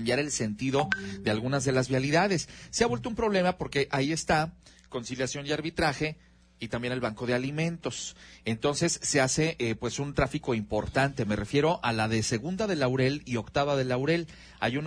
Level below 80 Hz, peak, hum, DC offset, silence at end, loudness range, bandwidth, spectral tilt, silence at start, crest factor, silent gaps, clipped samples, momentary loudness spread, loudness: -50 dBFS; -10 dBFS; none; under 0.1%; 0 s; 4 LU; 10.5 kHz; -4.5 dB/octave; 0 s; 18 dB; none; under 0.1%; 8 LU; -29 LUFS